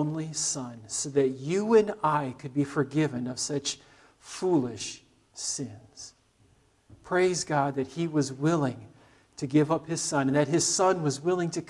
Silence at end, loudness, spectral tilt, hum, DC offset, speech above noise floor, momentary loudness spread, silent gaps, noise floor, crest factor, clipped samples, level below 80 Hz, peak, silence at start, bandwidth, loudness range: 0.05 s; -28 LUFS; -4.5 dB/octave; none; under 0.1%; 36 dB; 15 LU; none; -63 dBFS; 18 dB; under 0.1%; -66 dBFS; -10 dBFS; 0 s; 12 kHz; 6 LU